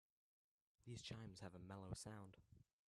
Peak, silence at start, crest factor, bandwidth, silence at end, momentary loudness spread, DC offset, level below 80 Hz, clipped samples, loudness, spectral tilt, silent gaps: -38 dBFS; 0.85 s; 20 dB; 13 kHz; 0.25 s; 8 LU; under 0.1%; -74 dBFS; under 0.1%; -57 LUFS; -4.5 dB/octave; none